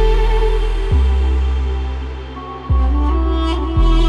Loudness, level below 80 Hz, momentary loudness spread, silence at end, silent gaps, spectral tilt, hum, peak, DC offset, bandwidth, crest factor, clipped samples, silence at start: -18 LUFS; -16 dBFS; 11 LU; 0 s; none; -7.5 dB/octave; none; -4 dBFS; under 0.1%; 7 kHz; 12 dB; under 0.1%; 0 s